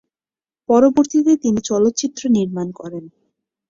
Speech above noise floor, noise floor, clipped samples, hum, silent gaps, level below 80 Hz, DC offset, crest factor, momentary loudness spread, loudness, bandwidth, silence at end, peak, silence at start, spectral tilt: over 74 dB; under -90 dBFS; under 0.1%; none; none; -56 dBFS; under 0.1%; 16 dB; 18 LU; -17 LUFS; 7.6 kHz; 0.6 s; -2 dBFS; 0.7 s; -5.5 dB/octave